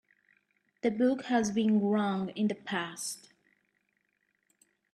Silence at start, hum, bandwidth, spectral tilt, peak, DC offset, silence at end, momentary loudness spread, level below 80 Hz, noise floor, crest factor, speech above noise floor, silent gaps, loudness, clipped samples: 0.85 s; none; 13 kHz; -5 dB/octave; -16 dBFS; under 0.1%; 1.75 s; 10 LU; -74 dBFS; -77 dBFS; 18 dB; 47 dB; none; -30 LUFS; under 0.1%